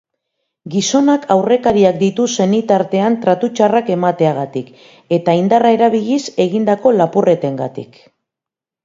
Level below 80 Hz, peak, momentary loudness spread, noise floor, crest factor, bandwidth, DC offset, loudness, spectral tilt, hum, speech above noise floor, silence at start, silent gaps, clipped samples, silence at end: -54 dBFS; 0 dBFS; 9 LU; -86 dBFS; 14 dB; 7.8 kHz; under 0.1%; -14 LUFS; -5.5 dB/octave; none; 73 dB; 0.65 s; none; under 0.1%; 1 s